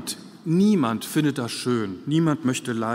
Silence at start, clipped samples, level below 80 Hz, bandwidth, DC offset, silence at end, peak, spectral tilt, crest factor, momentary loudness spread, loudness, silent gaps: 0 s; under 0.1%; -68 dBFS; 16 kHz; under 0.1%; 0 s; -8 dBFS; -5.5 dB/octave; 16 dB; 7 LU; -23 LUFS; none